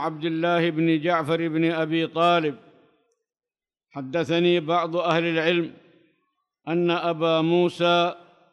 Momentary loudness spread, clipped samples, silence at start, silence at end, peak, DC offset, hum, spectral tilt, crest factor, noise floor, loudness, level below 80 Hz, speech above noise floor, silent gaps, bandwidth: 9 LU; under 0.1%; 0 s; 0.35 s; -8 dBFS; under 0.1%; none; -6.5 dB/octave; 16 dB; under -90 dBFS; -23 LUFS; -72 dBFS; over 68 dB; none; 10.5 kHz